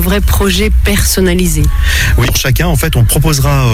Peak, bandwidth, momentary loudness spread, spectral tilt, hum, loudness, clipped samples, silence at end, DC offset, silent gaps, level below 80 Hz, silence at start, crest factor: 0 dBFS; 17.5 kHz; 2 LU; -4.5 dB/octave; none; -10 LUFS; under 0.1%; 0 s; under 0.1%; none; -14 dBFS; 0 s; 8 dB